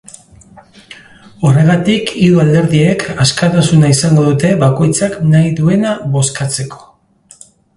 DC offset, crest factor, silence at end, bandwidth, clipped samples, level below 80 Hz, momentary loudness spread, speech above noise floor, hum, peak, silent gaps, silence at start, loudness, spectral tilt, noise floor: under 0.1%; 12 dB; 1 s; 11.5 kHz; under 0.1%; -42 dBFS; 6 LU; 35 dB; none; 0 dBFS; none; 0.9 s; -11 LUFS; -5.5 dB/octave; -45 dBFS